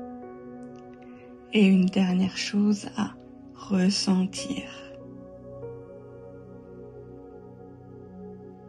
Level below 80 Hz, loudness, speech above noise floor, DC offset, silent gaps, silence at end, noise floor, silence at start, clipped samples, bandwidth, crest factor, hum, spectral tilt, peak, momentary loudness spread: -62 dBFS; -25 LUFS; 22 dB; under 0.1%; none; 0 s; -46 dBFS; 0 s; under 0.1%; 11 kHz; 18 dB; none; -5.5 dB/octave; -10 dBFS; 24 LU